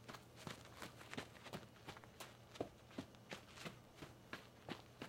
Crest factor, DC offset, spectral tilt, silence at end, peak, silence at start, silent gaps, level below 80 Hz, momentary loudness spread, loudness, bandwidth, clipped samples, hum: 26 dB; under 0.1%; -4 dB/octave; 0 s; -30 dBFS; 0 s; none; -76 dBFS; 5 LU; -55 LUFS; 16.5 kHz; under 0.1%; none